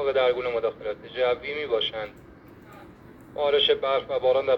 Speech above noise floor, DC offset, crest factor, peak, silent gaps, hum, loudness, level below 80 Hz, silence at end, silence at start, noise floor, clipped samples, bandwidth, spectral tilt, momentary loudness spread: 23 dB; under 0.1%; 16 dB; -10 dBFS; none; none; -25 LUFS; -58 dBFS; 0 s; 0 s; -48 dBFS; under 0.1%; 6 kHz; -5 dB/octave; 13 LU